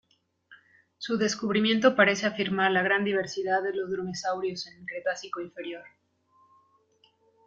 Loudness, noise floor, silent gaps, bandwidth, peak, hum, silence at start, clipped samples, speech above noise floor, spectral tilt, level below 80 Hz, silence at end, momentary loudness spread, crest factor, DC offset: -27 LUFS; -66 dBFS; none; 7.8 kHz; -6 dBFS; none; 0.5 s; under 0.1%; 39 dB; -4 dB/octave; -72 dBFS; 1.6 s; 15 LU; 22 dB; under 0.1%